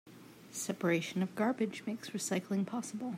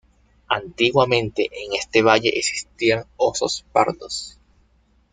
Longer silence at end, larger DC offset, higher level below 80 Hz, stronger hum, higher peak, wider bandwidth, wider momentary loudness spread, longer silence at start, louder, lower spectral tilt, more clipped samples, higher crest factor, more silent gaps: second, 0 s vs 0.8 s; neither; second, -84 dBFS vs -54 dBFS; neither; second, -20 dBFS vs -2 dBFS; first, 16 kHz vs 9.6 kHz; about the same, 10 LU vs 10 LU; second, 0.05 s vs 0.5 s; second, -36 LUFS vs -20 LUFS; first, -5 dB/octave vs -3.5 dB/octave; neither; about the same, 16 dB vs 20 dB; neither